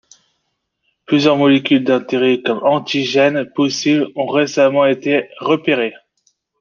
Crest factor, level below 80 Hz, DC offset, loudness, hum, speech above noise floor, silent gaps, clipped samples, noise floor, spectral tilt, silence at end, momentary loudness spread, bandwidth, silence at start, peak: 14 dB; -64 dBFS; under 0.1%; -15 LUFS; none; 56 dB; none; under 0.1%; -71 dBFS; -5 dB/octave; 0.65 s; 6 LU; 7.2 kHz; 1.1 s; -2 dBFS